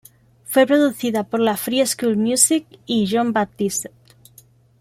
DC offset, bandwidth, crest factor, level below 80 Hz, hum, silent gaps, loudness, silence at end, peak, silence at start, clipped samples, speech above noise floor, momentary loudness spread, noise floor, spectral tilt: under 0.1%; 16 kHz; 20 dB; -62 dBFS; none; none; -19 LUFS; 0.95 s; 0 dBFS; 0.5 s; under 0.1%; 33 dB; 8 LU; -51 dBFS; -3.5 dB/octave